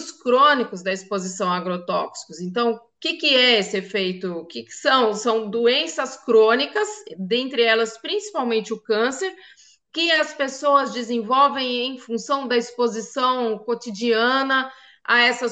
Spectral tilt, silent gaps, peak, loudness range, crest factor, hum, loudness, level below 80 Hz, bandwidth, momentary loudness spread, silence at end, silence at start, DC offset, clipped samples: -3 dB/octave; none; -4 dBFS; 3 LU; 18 dB; none; -21 LUFS; -76 dBFS; 9 kHz; 12 LU; 0 s; 0 s; under 0.1%; under 0.1%